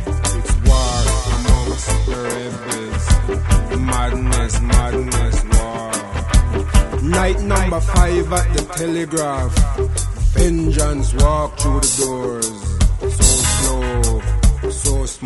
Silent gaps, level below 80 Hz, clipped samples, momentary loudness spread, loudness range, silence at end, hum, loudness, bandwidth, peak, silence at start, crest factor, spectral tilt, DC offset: none; -18 dBFS; under 0.1%; 6 LU; 2 LU; 0 s; none; -18 LUFS; 12 kHz; 0 dBFS; 0 s; 16 dB; -4.5 dB/octave; under 0.1%